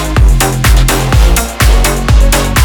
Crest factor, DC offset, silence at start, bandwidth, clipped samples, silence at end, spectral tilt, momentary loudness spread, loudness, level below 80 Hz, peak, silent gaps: 8 dB; under 0.1%; 0 s; over 20 kHz; 0.3%; 0 s; -4 dB/octave; 1 LU; -10 LUFS; -8 dBFS; 0 dBFS; none